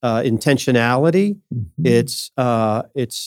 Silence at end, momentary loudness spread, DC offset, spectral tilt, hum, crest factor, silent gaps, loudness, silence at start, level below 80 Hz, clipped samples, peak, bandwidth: 0 s; 8 LU; under 0.1%; -6 dB/octave; none; 16 dB; none; -18 LUFS; 0.05 s; -58 dBFS; under 0.1%; -2 dBFS; 17.5 kHz